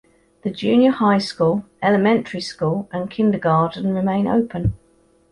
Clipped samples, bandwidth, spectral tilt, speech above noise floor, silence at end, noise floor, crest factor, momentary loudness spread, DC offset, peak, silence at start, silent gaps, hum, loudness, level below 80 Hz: under 0.1%; 11.5 kHz; -7 dB/octave; 38 dB; 0.55 s; -57 dBFS; 16 dB; 10 LU; under 0.1%; -4 dBFS; 0.45 s; none; none; -19 LUFS; -44 dBFS